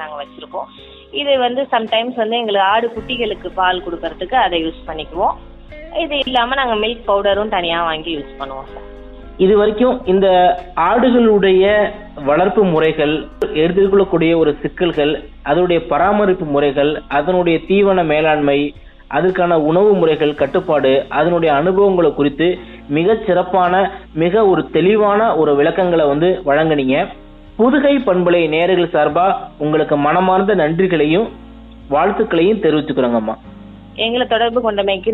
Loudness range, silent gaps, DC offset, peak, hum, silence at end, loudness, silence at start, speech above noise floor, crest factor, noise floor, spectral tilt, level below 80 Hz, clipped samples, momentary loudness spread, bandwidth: 4 LU; none; under 0.1%; -2 dBFS; none; 0 s; -15 LUFS; 0 s; 21 dB; 12 dB; -36 dBFS; -8.5 dB/octave; -40 dBFS; under 0.1%; 10 LU; 4.1 kHz